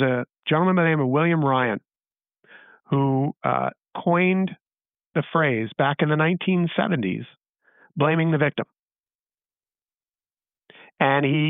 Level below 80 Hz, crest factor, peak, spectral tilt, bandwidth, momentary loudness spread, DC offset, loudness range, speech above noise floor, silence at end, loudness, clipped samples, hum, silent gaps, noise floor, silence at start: -70 dBFS; 18 dB; -6 dBFS; -5.5 dB/octave; 3.9 kHz; 9 LU; under 0.1%; 5 LU; over 69 dB; 0 s; -22 LUFS; under 0.1%; none; 0.39-0.43 s, 5.06-5.11 s, 7.49-7.54 s, 8.80-8.87 s, 9.00-9.04 s, 9.15-9.25 s; under -90 dBFS; 0 s